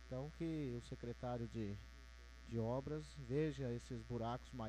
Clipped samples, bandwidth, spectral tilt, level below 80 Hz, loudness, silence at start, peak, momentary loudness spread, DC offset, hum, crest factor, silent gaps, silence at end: under 0.1%; 13 kHz; -7.5 dB/octave; -58 dBFS; -46 LUFS; 0 s; -28 dBFS; 12 LU; under 0.1%; none; 16 dB; none; 0 s